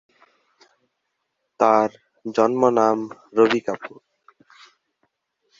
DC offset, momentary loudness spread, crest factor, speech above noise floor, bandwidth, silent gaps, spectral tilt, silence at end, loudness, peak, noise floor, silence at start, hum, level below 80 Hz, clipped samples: under 0.1%; 14 LU; 22 dB; 57 dB; 7.6 kHz; none; -5.5 dB/octave; 1.7 s; -20 LUFS; -2 dBFS; -76 dBFS; 1.6 s; none; -68 dBFS; under 0.1%